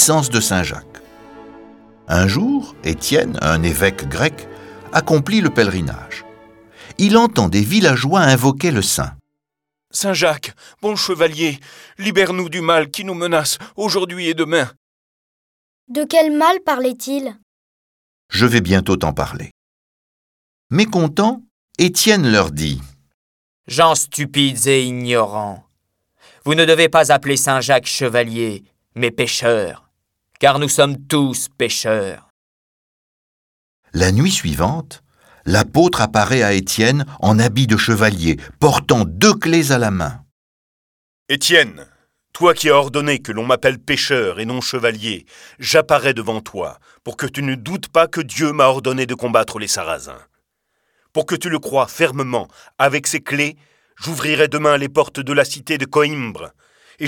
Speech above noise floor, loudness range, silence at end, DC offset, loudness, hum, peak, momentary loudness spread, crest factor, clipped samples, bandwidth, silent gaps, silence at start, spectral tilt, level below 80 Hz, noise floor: 66 dB; 5 LU; 0 s; under 0.1%; -16 LUFS; none; 0 dBFS; 13 LU; 18 dB; under 0.1%; 19 kHz; 14.77-15.87 s, 17.43-18.29 s, 19.51-20.70 s, 21.51-21.68 s, 23.14-23.64 s, 32.30-33.83 s, 40.31-41.26 s; 0 s; -4 dB/octave; -42 dBFS; -82 dBFS